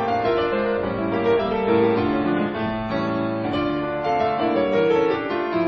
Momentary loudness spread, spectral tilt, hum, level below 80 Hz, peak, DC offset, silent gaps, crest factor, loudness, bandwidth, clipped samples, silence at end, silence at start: 5 LU; -8 dB/octave; none; -48 dBFS; -6 dBFS; under 0.1%; none; 14 dB; -22 LUFS; 6.4 kHz; under 0.1%; 0 s; 0 s